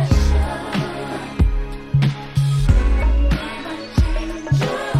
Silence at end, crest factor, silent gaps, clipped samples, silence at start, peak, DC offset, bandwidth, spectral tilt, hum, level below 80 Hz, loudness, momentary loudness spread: 0 s; 16 dB; none; under 0.1%; 0 s; -2 dBFS; under 0.1%; 12.5 kHz; -6.5 dB/octave; none; -20 dBFS; -20 LUFS; 9 LU